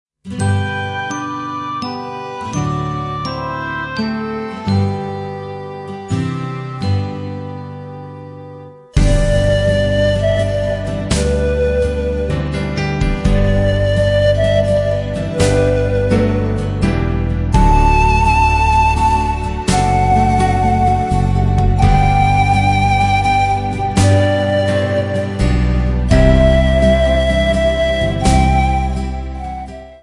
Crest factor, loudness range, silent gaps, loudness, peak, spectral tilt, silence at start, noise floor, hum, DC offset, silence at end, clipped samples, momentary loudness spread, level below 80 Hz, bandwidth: 14 dB; 8 LU; none; -15 LUFS; 0 dBFS; -6.5 dB/octave; 0.25 s; -35 dBFS; none; under 0.1%; 0.05 s; under 0.1%; 13 LU; -22 dBFS; 11.5 kHz